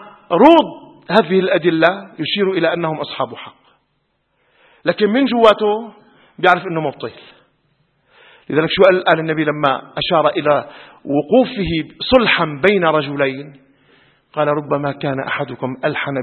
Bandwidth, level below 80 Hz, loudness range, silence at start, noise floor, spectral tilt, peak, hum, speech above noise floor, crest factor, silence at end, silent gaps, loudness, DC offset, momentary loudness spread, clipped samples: 8 kHz; -48 dBFS; 5 LU; 0 s; -66 dBFS; -7.5 dB/octave; 0 dBFS; none; 51 dB; 16 dB; 0 s; none; -16 LUFS; under 0.1%; 12 LU; under 0.1%